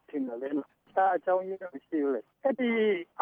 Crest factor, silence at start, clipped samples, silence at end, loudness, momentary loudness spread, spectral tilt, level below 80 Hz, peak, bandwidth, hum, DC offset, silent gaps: 16 dB; 0.15 s; under 0.1%; 0 s; -30 LUFS; 9 LU; -8 dB/octave; -84 dBFS; -14 dBFS; 3.7 kHz; none; under 0.1%; none